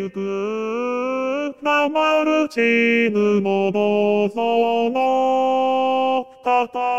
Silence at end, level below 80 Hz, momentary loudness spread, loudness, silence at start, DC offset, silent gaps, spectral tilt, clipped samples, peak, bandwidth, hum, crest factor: 0 s; -70 dBFS; 7 LU; -19 LUFS; 0 s; 0.2%; none; -5.5 dB/octave; under 0.1%; -6 dBFS; 13.5 kHz; none; 14 dB